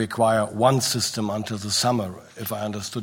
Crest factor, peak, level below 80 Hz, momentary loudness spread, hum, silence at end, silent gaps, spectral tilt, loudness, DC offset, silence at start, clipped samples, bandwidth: 18 dB; -6 dBFS; -62 dBFS; 10 LU; none; 0 s; none; -4 dB/octave; -23 LUFS; under 0.1%; 0 s; under 0.1%; 16.5 kHz